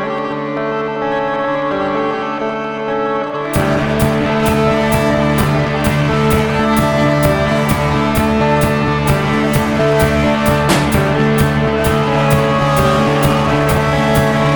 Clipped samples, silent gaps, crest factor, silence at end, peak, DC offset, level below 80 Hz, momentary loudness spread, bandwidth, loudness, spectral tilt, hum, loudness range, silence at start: under 0.1%; none; 14 dB; 0 s; 0 dBFS; 0.3%; -30 dBFS; 6 LU; 19.5 kHz; -14 LUFS; -6 dB/octave; none; 4 LU; 0 s